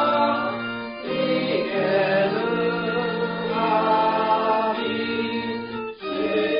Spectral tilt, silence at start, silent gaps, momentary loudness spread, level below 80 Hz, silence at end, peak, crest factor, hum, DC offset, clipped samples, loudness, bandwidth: -3 dB/octave; 0 s; none; 9 LU; -60 dBFS; 0 s; -8 dBFS; 14 dB; none; under 0.1%; under 0.1%; -23 LUFS; 5.2 kHz